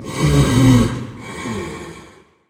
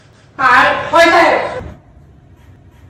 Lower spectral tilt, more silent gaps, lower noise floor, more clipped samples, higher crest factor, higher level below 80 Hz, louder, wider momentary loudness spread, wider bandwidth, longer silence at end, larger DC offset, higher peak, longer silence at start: first, -6 dB/octave vs -3.5 dB/octave; neither; about the same, -45 dBFS vs -42 dBFS; neither; about the same, 16 dB vs 14 dB; first, -30 dBFS vs -42 dBFS; second, -16 LUFS vs -10 LUFS; first, 19 LU vs 13 LU; about the same, 16.5 kHz vs 16 kHz; second, 0.45 s vs 1.15 s; neither; about the same, 0 dBFS vs 0 dBFS; second, 0 s vs 0.4 s